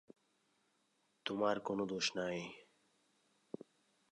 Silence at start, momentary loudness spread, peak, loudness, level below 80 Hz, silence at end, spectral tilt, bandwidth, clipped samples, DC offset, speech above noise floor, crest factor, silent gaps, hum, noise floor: 1.25 s; 16 LU; -20 dBFS; -39 LUFS; -80 dBFS; 1.5 s; -3.5 dB/octave; 11 kHz; under 0.1%; under 0.1%; 40 dB; 22 dB; none; none; -79 dBFS